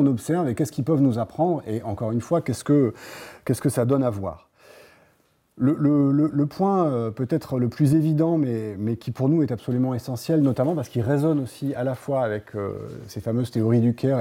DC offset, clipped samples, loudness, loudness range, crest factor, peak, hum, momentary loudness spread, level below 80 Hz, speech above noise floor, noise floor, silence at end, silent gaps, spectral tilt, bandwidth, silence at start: under 0.1%; under 0.1%; -23 LUFS; 3 LU; 14 dB; -8 dBFS; none; 9 LU; -60 dBFS; 41 dB; -63 dBFS; 0 s; none; -8 dB/octave; 16.5 kHz; 0 s